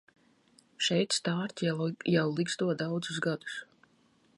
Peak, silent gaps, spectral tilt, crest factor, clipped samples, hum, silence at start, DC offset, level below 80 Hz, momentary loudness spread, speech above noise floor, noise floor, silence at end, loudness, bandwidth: -14 dBFS; none; -4.5 dB/octave; 18 dB; under 0.1%; none; 0.8 s; under 0.1%; -76 dBFS; 5 LU; 36 dB; -67 dBFS; 0.75 s; -31 LUFS; 11.5 kHz